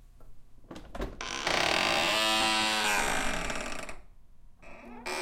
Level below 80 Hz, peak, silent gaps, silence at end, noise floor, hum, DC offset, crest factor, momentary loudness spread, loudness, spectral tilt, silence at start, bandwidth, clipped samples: -46 dBFS; -12 dBFS; none; 0 s; -50 dBFS; none; under 0.1%; 20 dB; 20 LU; -28 LUFS; -1.5 dB/octave; 0 s; 16.5 kHz; under 0.1%